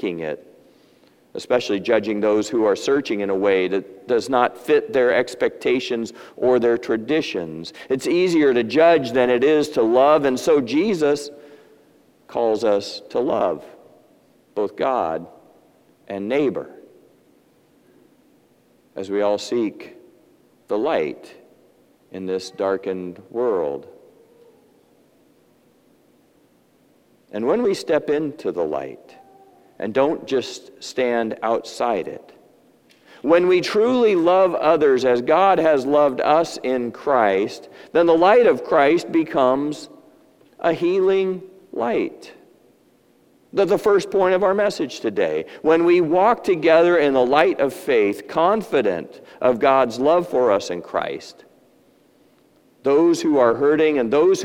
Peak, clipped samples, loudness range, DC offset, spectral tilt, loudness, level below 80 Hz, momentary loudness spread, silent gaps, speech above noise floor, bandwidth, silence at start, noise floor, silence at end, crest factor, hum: 0 dBFS; under 0.1%; 10 LU; under 0.1%; -5 dB/octave; -19 LUFS; -62 dBFS; 14 LU; none; 39 dB; 15.5 kHz; 0 s; -58 dBFS; 0 s; 20 dB; none